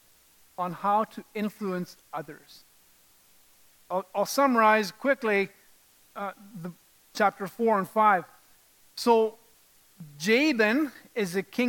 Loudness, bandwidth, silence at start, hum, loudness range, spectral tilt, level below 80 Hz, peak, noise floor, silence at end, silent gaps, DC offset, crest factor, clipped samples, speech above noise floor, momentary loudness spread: -26 LUFS; 17.5 kHz; 0.6 s; none; 7 LU; -4.5 dB/octave; -78 dBFS; -8 dBFS; -61 dBFS; 0 s; none; under 0.1%; 20 dB; under 0.1%; 34 dB; 18 LU